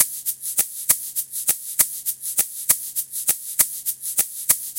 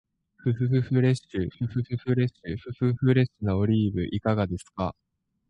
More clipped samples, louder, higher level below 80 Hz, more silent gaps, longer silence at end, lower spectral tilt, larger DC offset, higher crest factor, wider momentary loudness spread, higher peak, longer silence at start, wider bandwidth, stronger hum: neither; first, -21 LUFS vs -27 LUFS; second, -62 dBFS vs -48 dBFS; neither; second, 0 s vs 0.6 s; second, 1.5 dB/octave vs -8.5 dB/octave; neither; first, 24 dB vs 18 dB; second, 5 LU vs 10 LU; first, 0 dBFS vs -8 dBFS; second, 0 s vs 0.45 s; first, 17.5 kHz vs 10.5 kHz; neither